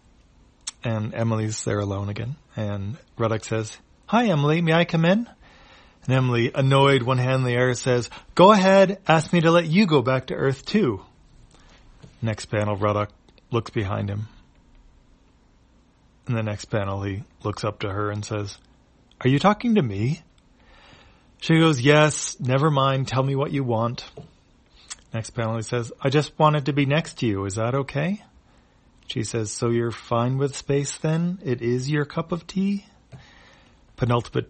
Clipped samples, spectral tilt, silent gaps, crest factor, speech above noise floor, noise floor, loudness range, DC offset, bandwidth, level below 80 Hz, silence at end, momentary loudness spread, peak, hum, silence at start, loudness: under 0.1%; -6 dB/octave; none; 22 dB; 36 dB; -57 dBFS; 10 LU; under 0.1%; 8.8 kHz; -54 dBFS; 0.05 s; 14 LU; 0 dBFS; none; 0.65 s; -23 LUFS